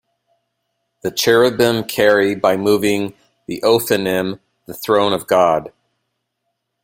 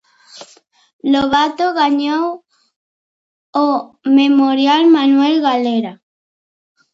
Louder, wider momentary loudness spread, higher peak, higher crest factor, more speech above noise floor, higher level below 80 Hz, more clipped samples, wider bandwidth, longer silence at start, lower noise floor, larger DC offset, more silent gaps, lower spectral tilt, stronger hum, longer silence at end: about the same, -16 LUFS vs -14 LUFS; first, 14 LU vs 11 LU; about the same, 0 dBFS vs 0 dBFS; about the same, 18 dB vs 16 dB; first, 58 dB vs 35 dB; about the same, -56 dBFS vs -56 dBFS; neither; first, 16.5 kHz vs 7.8 kHz; first, 1.05 s vs 0.35 s; first, -74 dBFS vs -48 dBFS; neither; second, none vs 0.93-0.99 s, 2.76-3.53 s; about the same, -4 dB/octave vs -4.5 dB/octave; neither; first, 1.15 s vs 1 s